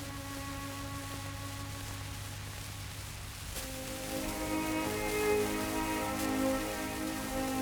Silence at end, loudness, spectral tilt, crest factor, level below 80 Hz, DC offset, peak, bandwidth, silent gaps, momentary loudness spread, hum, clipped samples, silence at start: 0 s; -36 LUFS; -4 dB/octave; 18 dB; -50 dBFS; under 0.1%; -18 dBFS; over 20 kHz; none; 10 LU; none; under 0.1%; 0 s